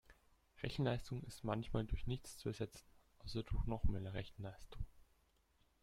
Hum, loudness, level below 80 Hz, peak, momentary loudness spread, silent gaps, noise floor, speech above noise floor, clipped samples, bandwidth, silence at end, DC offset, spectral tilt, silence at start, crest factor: none; -45 LUFS; -50 dBFS; -24 dBFS; 13 LU; none; -76 dBFS; 34 dB; under 0.1%; 14 kHz; 0.8 s; under 0.1%; -6.5 dB/octave; 0.1 s; 20 dB